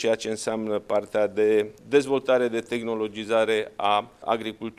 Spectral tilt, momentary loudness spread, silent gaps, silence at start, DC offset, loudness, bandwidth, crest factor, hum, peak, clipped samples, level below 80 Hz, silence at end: -4.5 dB/octave; 6 LU; none; 0 s; under 0.1%; -25 LUFS; 12.5 kHz; 18 dB; none; -8 dBFS; under 0.1%; -64 dBFS; 0.1 s